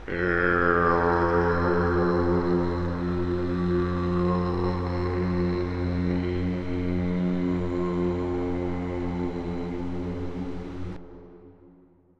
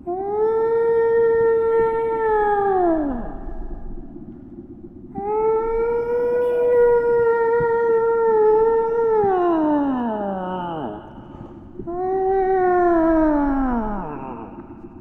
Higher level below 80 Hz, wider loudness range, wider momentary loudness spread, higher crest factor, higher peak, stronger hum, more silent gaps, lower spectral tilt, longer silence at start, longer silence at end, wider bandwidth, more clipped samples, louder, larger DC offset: about the same, -42 dBFS vs -38 dBFS; about the same, 8 LU vs 7 LU; second, 10 LU vs 21 LU; about the same, 18 dB vs 14 dB; about the same, -8 dBFS vs -6 dBFS; neither; neither; about the same, -9 dB/octave vs -9.5 dB/octave; about the same, 0 s vs 0.05 s; first, 0.5 s vs 0 s; first, 7.2 kHz vs 3.9 kHz; neither; second, -26 LUFS vs -19 LUFS; neither